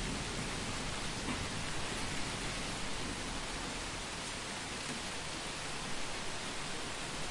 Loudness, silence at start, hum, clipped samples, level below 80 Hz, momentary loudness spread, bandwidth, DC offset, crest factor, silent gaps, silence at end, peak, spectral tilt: -39 LUFS; 0 s; none; under 0.1%; -50 dBFS; 2 LU; 11.5 kHz; under 0.1%; 14 dB; none; 0 s; -24 dBFS; -2.5 dB/octave